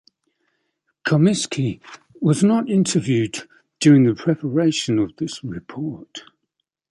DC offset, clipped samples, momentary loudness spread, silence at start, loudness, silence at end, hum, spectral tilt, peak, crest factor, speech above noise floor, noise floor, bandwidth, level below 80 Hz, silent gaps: under 0.1%; under 0.1%; 17 LU; 1.05 s; -19 LUFS; 0.7 s; none; -6 dB/octave; -4 dBFS; 18 dB; 58 dB; -77 dBFS; 11.5 kHz; -58 dBFS; none